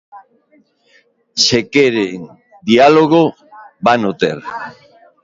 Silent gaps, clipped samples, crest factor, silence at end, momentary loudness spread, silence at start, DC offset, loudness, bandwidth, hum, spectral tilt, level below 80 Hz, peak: none; under 0.1%; 16 dB; 0.55 s; 18 LU; 0.15 s; under 0.1%; -13 LUFS; 7.8 kHz; none; -4 dB/octave; -54 dBFS; 0 dBFS